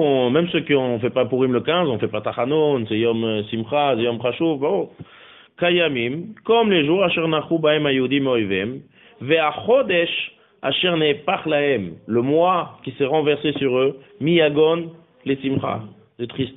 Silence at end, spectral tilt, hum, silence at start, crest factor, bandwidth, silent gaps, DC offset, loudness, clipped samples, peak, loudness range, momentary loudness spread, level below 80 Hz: 0 s; -3.5 dB/octave; none; 0 s; 16 dB; 4 kHz; none; under 0.1%; -20 LUFS; under 0.1%; -4 dBFS; 2 LU; 9 LU; -60 dBFS